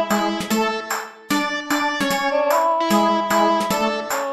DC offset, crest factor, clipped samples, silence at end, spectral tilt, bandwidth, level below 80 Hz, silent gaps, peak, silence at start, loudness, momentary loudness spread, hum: under 0.1%; 14 dB; under 0.1%; 0 s; -3.5 dB/octave; 15.5 kHz; -56 dBFS; none; -6 dBFS; 0 s; -20 LUFS; 6 LU; none